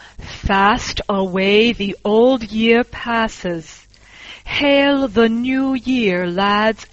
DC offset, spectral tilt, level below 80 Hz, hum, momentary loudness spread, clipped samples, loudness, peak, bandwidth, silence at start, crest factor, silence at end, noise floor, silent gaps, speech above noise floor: under 0.1%; -5 dB/octave; -38 dBFS; none; 12 LU; under 0.1%; -16 LUFS; -2 dBFS; 8 kHz; 0.2 s; 16 dB; 0.05 s; -41 dBFS; none; 25 dB